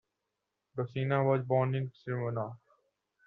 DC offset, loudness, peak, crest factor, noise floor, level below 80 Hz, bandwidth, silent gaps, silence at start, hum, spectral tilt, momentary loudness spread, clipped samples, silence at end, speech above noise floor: under 0.1%; -32 LUFS; -14 dBFS; 20 dB; -85 dBFS; -72 dBFS; 4.7 kHz; none; 0.75 s; none; -7.5 dB/octave; 11 LU; under 0.1%; 0.7 s; 54 dB